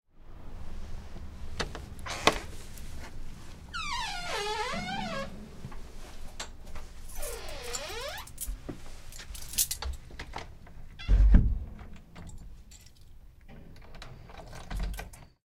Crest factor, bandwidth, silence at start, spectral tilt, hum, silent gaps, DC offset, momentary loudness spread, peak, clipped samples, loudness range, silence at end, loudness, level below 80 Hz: 30 dB; 17 kHz; 0.15 s; -3.5 dB/octave; none; none; under 0.1%; 22 LU; -2 dBFS; under 0.1%; 10 LU; 0.2 s; -33 LUFS; -34 dBFS